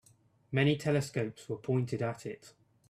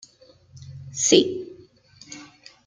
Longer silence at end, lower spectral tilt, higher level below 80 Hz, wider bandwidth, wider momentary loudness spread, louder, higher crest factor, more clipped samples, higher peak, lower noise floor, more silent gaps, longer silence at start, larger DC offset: about the same, 0.4 s vs 0.4 s; first, -6.5 dB/octave vs -2.5 dB/octave; about the same, -68 dBFS vs -66 dBFS; first, 13.5 kHz vs 10 kHz; second, 14 LU vs 24 LU; second, -33 LUFS vs -19 LUFS; about the same, 20 dB vs 24 dB; neither; second, -14 dBFS vs -2 dBFS; first, -66 dBFS vs -54 dBFS; neither; about the same, 0.5 s vs 0.55 s; neither